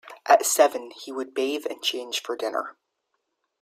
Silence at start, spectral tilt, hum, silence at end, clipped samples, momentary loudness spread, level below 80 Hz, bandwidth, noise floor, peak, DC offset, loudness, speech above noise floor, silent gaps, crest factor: 0.05 s; 0.5 dB/octave; none; 0.9 s; under 0.1%; 15 LU; -82 dBFS; 16 kHz; -77 dBFS; -4 dBFS; under 0.1%; -24 LUFS; 51 dB; none; 22 dB